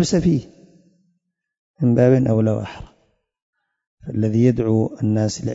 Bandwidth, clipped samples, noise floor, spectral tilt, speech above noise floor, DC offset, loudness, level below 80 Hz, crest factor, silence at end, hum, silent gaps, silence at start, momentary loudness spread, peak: 8 kHz; under 0.1%; -71 dBFS; -7.5 dB/octave; 53 dB; under 0.1%; -19 LUFS; -46 dBFS; 18 dB; 0 s; none; 1.58-1.74 s, 3.42-3.53 s, 3.87-3.97 s; 0 s; 14 LU; -2 dBFS